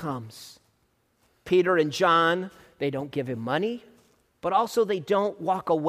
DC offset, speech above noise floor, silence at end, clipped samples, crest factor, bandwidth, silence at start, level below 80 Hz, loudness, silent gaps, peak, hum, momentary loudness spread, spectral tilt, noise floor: under 0.1%; 44 dB; 0 s; under 0.1%; 16 dB; 15.5 kHz; 0 s; -66 dBFS; -25 LUFS; none; -10 dBFS; none; 17 LU; -5.5 dB/octave; -69 dBFS